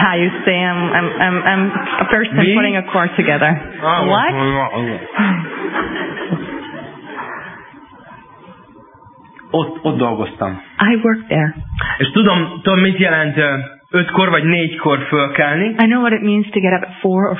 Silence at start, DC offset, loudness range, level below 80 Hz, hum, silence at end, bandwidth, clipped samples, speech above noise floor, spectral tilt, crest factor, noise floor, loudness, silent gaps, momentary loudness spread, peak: 0 s; under 0.1%; 11 LU; -44 dBFS; none; 0 s; 3.9 kHz; under 0.1%; 28 dB; -10 dB/octave; 16 dB; -43 dBFS; -15 LUFS; none; 10 LU; 0 dBFS